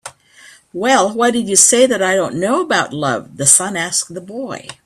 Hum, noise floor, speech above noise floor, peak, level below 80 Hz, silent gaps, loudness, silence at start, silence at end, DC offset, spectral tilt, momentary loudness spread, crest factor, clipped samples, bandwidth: none; -45 dBFS; 29 dB; 0 dBFS; -58 dBFS; none; -13 LUFS; 0.05 s; 0.15 s; under 0.1%; -2 dB/octave; 17 LU; 16 dB; under 0.1%; 16 kHz